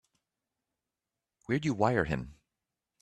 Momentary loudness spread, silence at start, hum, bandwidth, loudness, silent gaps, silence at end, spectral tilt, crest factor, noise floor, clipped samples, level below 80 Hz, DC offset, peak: 9 LU; 1.5 s; none; 11.5 kHz; -31 LUFS; none; 0.7 s; -7 dB/octave; 24 dB; -90 dBFS; under 0.1%; -56 dBFS; under 0.1%; -12 dBFS